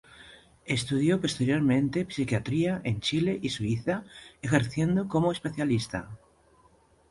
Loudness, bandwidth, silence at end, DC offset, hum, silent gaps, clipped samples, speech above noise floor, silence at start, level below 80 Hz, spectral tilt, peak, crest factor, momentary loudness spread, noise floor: -28 LUFS; 11.5 kHz; 0.95 s; under 0.1%; none; none; under 0.1%; 34 dB; 0.2 s; -56 dBFS; -6 dB/octave; -8 dBFS; 20 dB; 10 LU; -62 dBFS